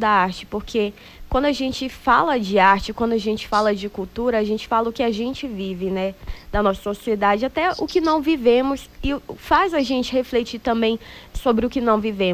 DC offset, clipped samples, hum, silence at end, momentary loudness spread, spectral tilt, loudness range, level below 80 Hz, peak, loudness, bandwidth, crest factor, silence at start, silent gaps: under 0.1%; under 0.1%; none; 0 s; 9 LU; -5.5 dB/octave; 3 LU; -40 dBFS; -4 dBFS; -21 LUFS; 16 kHz; 18 dB; 0 s; none